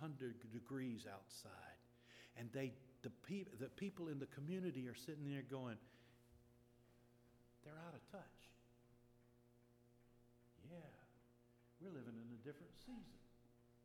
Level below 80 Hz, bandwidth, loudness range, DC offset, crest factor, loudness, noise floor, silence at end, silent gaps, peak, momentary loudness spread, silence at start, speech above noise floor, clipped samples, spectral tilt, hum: -80 dBFS; 17 kHz; 14 LU; under 0.1%; 20 dB; -53 LUFS; -73 dBFS; 0 s; none; -34 dBFS; 16 LU; 0 s; 21 dB; under 0.1%; -6.5 dB/octave; none